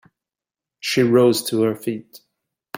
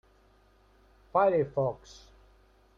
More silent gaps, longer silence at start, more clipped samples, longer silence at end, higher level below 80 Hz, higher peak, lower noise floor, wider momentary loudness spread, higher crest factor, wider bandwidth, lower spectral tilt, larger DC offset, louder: neither; second, 0.85 s vs 1.15 s; neither; second, 0.6 s vs 1 s; about the same, -64 dBFS vs -60 dBFS; first, -4 dBFS vs -12 dBFS; first, -89 dBFS vs -63 dBFS; first, 14 LU vs 9 LU; about the same, 18 dB vs 20 dB; first, 16.5 kHz vs 7.6 kHz; second, -5 dB/octave vs -7.5 dB/octave; neither; first, -19 LUFS vs -28 LUFS